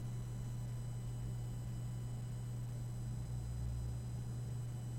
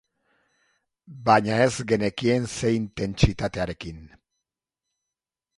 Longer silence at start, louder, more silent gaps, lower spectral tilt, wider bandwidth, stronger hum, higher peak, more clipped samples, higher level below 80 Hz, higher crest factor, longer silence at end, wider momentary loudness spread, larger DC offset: second, 0 s vs 1.1 s; second, -44 LUFS vs -24 LUFS; neither; first, -7 dB/octave vs -5.5 dB/octave; first, 16 kHz vs 11.5 kHz; neither; second, -32 dBFS vs -2 dBFS; neither; second, -50 dBFS vs -42 dBFS; second, 10 dB vs 24 dB; second, 0 s vs 1.5 s; second, 1 LU vs 11 LU; neither